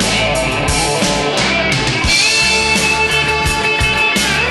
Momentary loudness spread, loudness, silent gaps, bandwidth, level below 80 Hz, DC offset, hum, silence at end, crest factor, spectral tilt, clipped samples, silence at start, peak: 4 LU; -12 LUFS; none; 12.5 kHz; -28 dBFS; under 0.1%; none; 0 s; 14 dB; -2.5 dB/octave; under 0.1%; 0 s; 0 dBFS